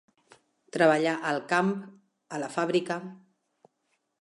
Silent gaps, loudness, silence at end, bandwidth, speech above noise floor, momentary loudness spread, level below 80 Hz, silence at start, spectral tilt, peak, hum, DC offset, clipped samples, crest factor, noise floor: none; -27 LUFS; 1.05 s; 11.5 kHz; 50 dB; 16 LU; -84 dBFS; 0.75 s; -5.5 dB/octave; -8 dBFS; none; under 0.1%; under 0.1%; 22 dB; -77 dBFS